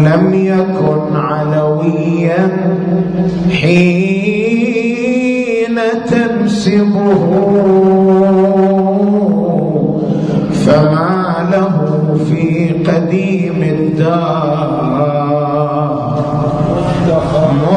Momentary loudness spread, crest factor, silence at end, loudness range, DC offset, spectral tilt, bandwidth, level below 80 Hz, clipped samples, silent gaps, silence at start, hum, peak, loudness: 5 LU; 10 dB; 0 s; 3 LU; under 0.1%; -8 dB/octave; 10 kHz; -40 dBFS; under 0.1%; none; 0 s; none; 0 dBFS; -12 LUFS